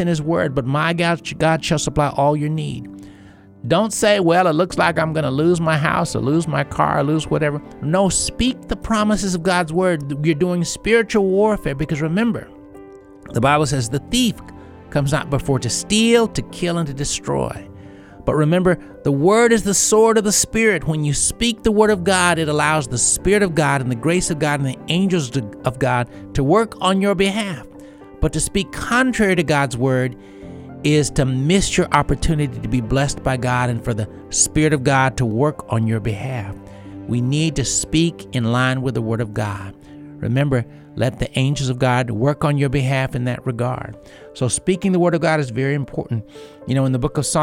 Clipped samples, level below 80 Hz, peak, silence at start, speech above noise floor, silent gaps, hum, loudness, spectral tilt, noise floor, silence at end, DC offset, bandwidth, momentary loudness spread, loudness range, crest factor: under 0.1%; -38 dBFS; 0 dBFS; 0 s; 26 dB; none; none; -18 LUFS; -4.5 dB/octave; -44 dBFS; 0 s; under 0.1%; 16.5 kHz; 10 LU; 4 LU; 18 dB